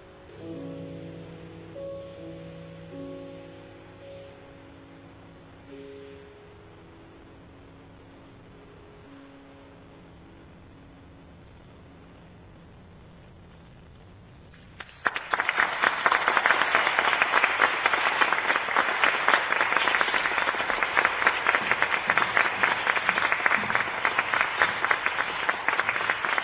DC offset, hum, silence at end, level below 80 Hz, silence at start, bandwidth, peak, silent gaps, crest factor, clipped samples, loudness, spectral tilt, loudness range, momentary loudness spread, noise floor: under 0.1%; none; 0 s; -58 dBFS; 0 s; 4 kHz; -4 dBFS; none; 24 dB; under 0.1%; -23 LUFS; 0 dB/octave; 21 LU; 22 LU; -49 dBFS